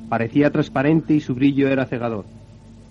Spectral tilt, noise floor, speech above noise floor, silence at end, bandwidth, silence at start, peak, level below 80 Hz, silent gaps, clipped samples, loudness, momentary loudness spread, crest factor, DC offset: -8.5 dB/octave; -43 dBFS; 24 dB; 0.2 s; 7.2 kHz; 0 s; -4 dBFS; -50 dBFS; none; under 0.1%; -19 LUFS; 8 LU; 16 dB; under 0.1%